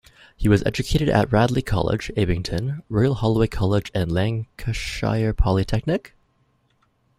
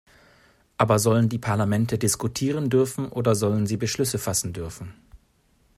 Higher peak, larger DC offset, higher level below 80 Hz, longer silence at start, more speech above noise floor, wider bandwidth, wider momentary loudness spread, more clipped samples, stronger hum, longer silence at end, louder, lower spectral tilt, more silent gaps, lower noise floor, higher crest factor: about the same, -2 dBFS vs -4 dBFS; neither; first, -32 dBFS vs -54 dBFS; second, 0.4 s vs 0.8 s; first, 44 dB vs 40 dB; about the same, 14.5 kHz vs 15.5 kHz; second, 7 LU vs 13 LU; neither; neither; first, 1.1 s vs 0.6 s; about the same, -22 LUFS vs -23 LUFS; first, -7 dB/octave vs -5.5 dB/octave; neither; about the same, -65 dBFS vs -63 dBFS; about the same, 18 dB vs 20 dB